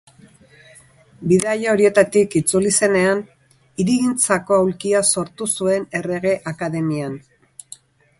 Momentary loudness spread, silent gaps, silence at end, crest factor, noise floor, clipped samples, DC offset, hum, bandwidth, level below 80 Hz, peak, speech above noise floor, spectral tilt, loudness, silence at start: 11 LU; none; 1 s; 18 dB; -49 dBFS; under 0.1%; under 0.1%; none; 12 kHz; -56 dBFS; 0 dBFS; 31 dB; -4.5 dB/octave; -18 LUFS; 1.2 s